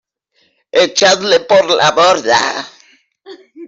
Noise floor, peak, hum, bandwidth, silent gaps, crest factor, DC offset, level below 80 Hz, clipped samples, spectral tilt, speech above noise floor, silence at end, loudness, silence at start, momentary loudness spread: -59 dBFS; 0 dBFS; none; 8 kHz; none; 12 dB; under 0.1%; -58 dBFS; under 0.1%; -2 dB/octave; 48 dB; 0 s; -11 LUFS; 0.75 s; 9 LU